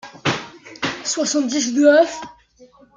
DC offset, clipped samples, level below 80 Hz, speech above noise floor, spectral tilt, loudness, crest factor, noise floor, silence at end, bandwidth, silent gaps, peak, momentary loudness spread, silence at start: under 0.1%; under 0.1%; -60 dBFS; 33 dB; -3.5 dB/octave; -18 LUFS; 18 dB; -50 dBFS; 0.7 s; 9.6 kHz; none; -2 dBFS; 19 LU; 0.05 s